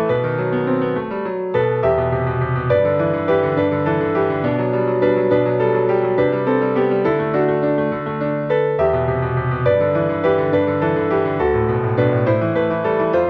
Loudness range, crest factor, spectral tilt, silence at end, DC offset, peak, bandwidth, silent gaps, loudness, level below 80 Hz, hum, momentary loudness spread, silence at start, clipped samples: 1 LU; 14 dB; -10 dB/octave; 0 s; under 0.1%; -4 dBFS; 5.4 kHz; none; -18 LUFS; -42 dBFS; none; 3 LU; 0 s; under 0.1%